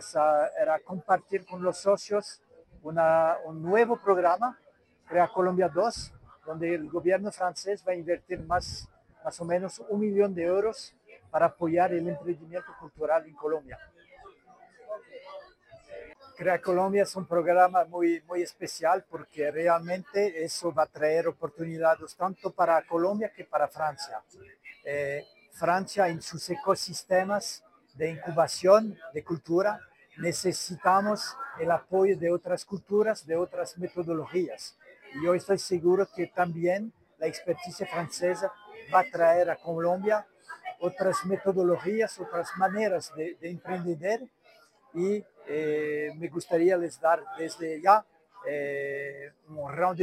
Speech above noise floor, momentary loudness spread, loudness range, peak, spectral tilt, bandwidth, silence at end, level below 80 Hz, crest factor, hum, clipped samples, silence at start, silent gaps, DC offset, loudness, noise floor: 33 dB; 15 LU; 5 LU; -6 dBFS; -5 dB/octave; 15.5 kHz; 0 s; -64 dBFS; 22 dB; none; under 0.1%; 0 s; none; under 0.1%; -28 LUFS; -60 dBFS